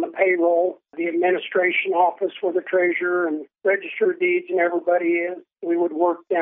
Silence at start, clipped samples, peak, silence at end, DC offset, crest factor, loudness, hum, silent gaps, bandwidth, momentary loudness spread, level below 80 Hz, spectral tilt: 0 s; under 0.1%; -6 dBFS; 0 s; under 0.1%; 16 dB; -21 LUFS; none; none; 3.7 kHz; 7 LU; under -90 dBFS; -9 dB/octave